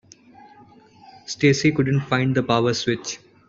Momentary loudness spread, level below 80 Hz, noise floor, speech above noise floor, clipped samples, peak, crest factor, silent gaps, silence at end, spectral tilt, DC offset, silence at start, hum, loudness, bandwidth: 14 LU; -56 dBFS; -50 dBFS; 30 dB; under 0.1%; -4 dBFS; 18 dB; none; 0.3 s; -5.5 dB/octave; under 0.1%; 1.3 s; none; -21 LUFS; 7.8 kHz